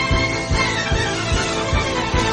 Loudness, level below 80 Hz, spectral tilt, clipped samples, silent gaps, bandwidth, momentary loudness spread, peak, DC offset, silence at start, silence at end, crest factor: -19 LUFS; -28 dBFS; -4 dB/octave; under 0.1%; none; 10.5 kHz; 1 LU; -4 dBFS; under 0.1%; 0 s; 0 s; 16 dB